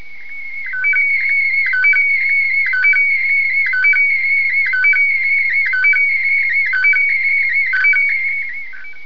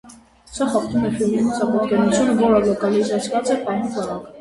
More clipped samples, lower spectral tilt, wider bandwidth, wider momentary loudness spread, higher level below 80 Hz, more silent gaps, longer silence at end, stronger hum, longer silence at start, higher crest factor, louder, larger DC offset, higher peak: neither; second, -1 dB/octave vs -5.5 dB/octave; second, 5.4 kHz vs 11.5 kHz; about the same, 8 LU vs 8 LU; second, -64 dBFS vs -50 dBFS; neither; about the same, 0 s vs 0 s; neither; about the same, 0 s vs 0.05 s; second, 10 dB vs 16 dB; first, -12 LUFS vs -19 LUFS; first, 4% vs under 0.1%; second, -6 dBFS vs -2 dBFS